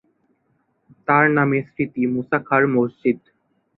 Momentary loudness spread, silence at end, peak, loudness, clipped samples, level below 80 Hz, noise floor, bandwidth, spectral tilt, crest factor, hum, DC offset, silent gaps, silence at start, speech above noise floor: 9 LU; 0.6 s; -2 dBFS; -19 LUFS; under 0.1%; -62 dBFS; -67 dBFS; 4.1 kHz; -11.5 dB/octave; 18 dB; none; under 0.1%; none; 1.1 s; 48 dB